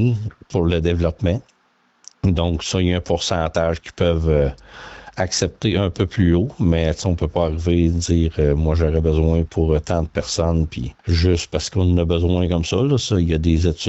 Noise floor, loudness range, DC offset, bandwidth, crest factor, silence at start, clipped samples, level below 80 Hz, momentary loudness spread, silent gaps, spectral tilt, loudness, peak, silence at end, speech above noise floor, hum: -61 dBFS; 2 LU; under 0.1%; 8.2 kHz; 14 dB; 0 s; under 0.1%; -32 dBFS; 5 LU; none; -6 dB/octave; -19 LUFS; -4 dBFS; 0 s; 43 dB; none